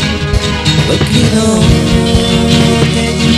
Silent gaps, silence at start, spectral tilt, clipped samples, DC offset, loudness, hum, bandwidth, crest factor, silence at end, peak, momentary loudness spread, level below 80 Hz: none; 0 s; -5 dB/octave; 0.3%; 0.4%; -10 LUFS; none; 14 kHz; 10 dB; 0 s; 0 dBFS; 3 LU; -20 dBFS